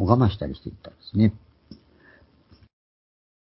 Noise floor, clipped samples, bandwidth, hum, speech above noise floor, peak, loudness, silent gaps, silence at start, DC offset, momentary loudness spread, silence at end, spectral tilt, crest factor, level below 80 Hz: -56 dBFS; under 0.1%; 5.8 kHz; none; 33 dB; -2 dBFS; -23 LUFS; none; 0 s; under 0.1%; 20 LU; 1.7 s; -12.5 dB/octave; 24 dB; -42 dBFS